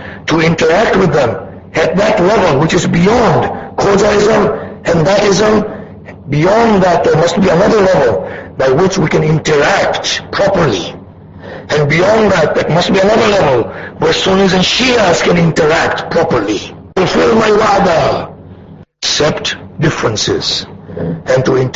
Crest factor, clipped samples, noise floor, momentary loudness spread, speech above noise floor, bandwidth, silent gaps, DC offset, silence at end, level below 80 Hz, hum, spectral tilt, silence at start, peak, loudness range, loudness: 12 dB; under 0.1%; -35 dBFS; 10 LU; 25 dB; 8 kHz; none; under 0.1%; 0 s; -36 dBFS; none; -5 dB/octave; 0 s; 0 dBFS; 2 LU; -11 LUFS